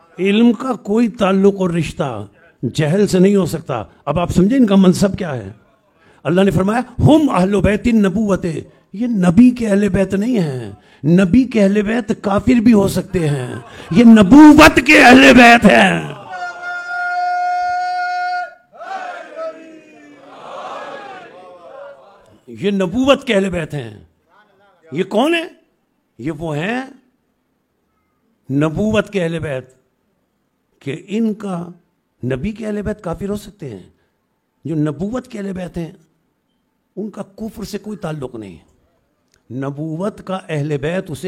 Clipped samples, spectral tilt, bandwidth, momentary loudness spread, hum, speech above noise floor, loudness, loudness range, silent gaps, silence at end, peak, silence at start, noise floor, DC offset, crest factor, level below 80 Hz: under 0.1%; -6 dB/octave; 16 kHz; 21 LU; none; 53 dB; -14 LUFS; 20 LU; none; 0 s; 0 dBFS; 0.2 s; -66 dBFS; under 0.1%; 16 dB; -40 dBFS